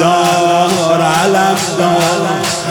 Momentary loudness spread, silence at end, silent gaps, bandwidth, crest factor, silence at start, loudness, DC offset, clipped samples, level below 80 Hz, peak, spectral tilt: 3 LU; 0 s; none; 19.5 kHz; 12 dB; 0 s; -12 LUFS; under 0.1%; under 0.1%; -54 dBFS; 0 dBFS; -4 dB/octave